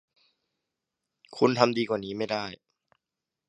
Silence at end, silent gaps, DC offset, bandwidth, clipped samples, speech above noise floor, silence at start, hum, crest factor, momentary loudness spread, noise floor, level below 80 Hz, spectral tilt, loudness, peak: 0.95 s; none; under 0.1%; 10 kHz; under 0.1%; 62 dB; 1.3 s; none; 28 dB; 14 LU; -88 dBFS; -70 dBFS; -5.5 dB/octave; -27 LUFS; -2 dBFS